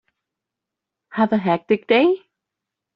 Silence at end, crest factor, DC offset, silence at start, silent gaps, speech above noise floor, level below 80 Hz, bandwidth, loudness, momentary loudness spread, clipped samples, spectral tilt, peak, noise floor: 0.8 s; 18 dB; under 0.1%; 1.15 s; none; 67 dB; -66 dBFS; 5.6 kHz; -19 LUFS; 9 LU; under 0.1%; -4 dB/octave; -4 dBFS; -85 dBFS